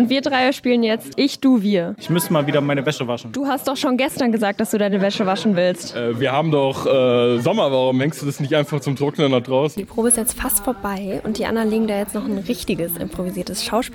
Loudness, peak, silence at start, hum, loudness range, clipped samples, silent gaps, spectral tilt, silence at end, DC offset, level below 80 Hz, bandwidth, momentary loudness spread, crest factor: -19 LUFS; -2 dBFS; 0 s; none; 2 LU; under 0.1%; none; -4.5 dB/octave; 0 s; under 0.1%; -48 dBFS; 18 kHz; 7 LU; 16 dB